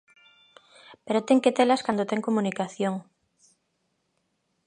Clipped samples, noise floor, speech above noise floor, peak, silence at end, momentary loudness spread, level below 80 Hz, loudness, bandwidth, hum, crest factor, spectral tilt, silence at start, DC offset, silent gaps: under 0.1%; -75 dBFS; 51 dB; -6 dBFS; 1.65 s; 9 LU; -76 dBFS; -25 LUFS; 10.5 kHz; none; 22 dB; -5.5 dB/octave; 0.9 s; under 0.1%; none